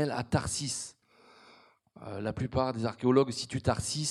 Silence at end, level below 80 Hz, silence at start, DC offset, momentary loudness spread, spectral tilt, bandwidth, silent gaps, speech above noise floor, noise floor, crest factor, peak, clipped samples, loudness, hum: 0 s; -56 dBFS; 0 s; under 0.1%; 12 LU; -5 dB/octave; 13 kHz; none; 30 dB; -60 dBFS; 22 dB; -10 dBFS; under 0.1%; -31 LUFS; none